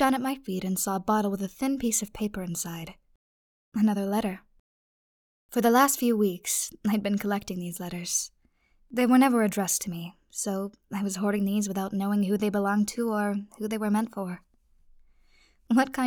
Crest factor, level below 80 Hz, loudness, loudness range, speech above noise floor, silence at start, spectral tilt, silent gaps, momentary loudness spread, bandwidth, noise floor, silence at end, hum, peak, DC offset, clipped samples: 20 dB; -60 dBFS; -27 LUFS; 4 LU; 38 dB; 0 s; -4.5 dB/octave; 3.16-3.72 s, 4.59-5.49 s; 12 LU; over 20 kHz; -65 dBFS; 0 s; none; -8 dBFS; under 0.1%; under 0.1%